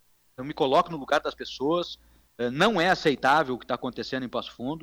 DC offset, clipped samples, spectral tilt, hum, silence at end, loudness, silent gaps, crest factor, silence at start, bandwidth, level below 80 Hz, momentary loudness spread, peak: under 0.1%; under 0.1%; -5 dB/octave; none; 0 s; -26 LUFS; none; 16 dB; 0.4 s; over 20 kHz; -58 dBFS; 12 LU; -12 dBFS